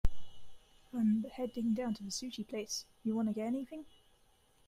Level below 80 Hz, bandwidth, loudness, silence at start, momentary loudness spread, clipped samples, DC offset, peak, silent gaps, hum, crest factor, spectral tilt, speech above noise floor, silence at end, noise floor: -48 dBFS; 15.5 kHz; -37 LUFS; 0.05 s; 10 LU; under 0.1%; under 0.1%; -16 dBFS; none; none; 20 dB; -5 dB/octave; 31 dB; 0.8 s; -68 dBFS